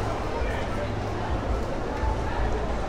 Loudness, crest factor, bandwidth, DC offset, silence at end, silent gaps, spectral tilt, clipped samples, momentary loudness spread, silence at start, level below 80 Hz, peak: -29 LUFS; 14 dB; 11 kHz; under 0.1%; 0 s; none; -6.5 dB/octave; under 0.1%; 1 LU; 0 s; -32 dBFS; -14 dBFS